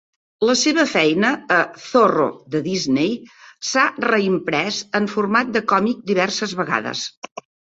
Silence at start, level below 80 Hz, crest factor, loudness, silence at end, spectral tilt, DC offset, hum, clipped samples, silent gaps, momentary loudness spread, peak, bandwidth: 0.4 s; -62 dBFS; 18 dB; -19 LUFS; 0.35 s; -4 dB/octave; under 0.1%; none; under 0.1%; 7.17-7.22 s, 7.32-7.36 s; 9 LU; -2 dBFS; 8 kHz